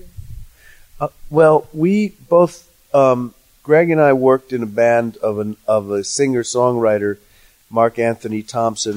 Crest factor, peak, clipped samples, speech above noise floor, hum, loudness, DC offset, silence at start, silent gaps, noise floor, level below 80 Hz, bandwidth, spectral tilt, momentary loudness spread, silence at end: 16 dB; -2 dBFS; under 0.1%; 29 dB; none; -16 LUFS; under 0.1%; 0.05 s; none; -44 dBFS; -46 dBFS; 16 kHz; -5.5 dB/octave; 11 LU; 0 s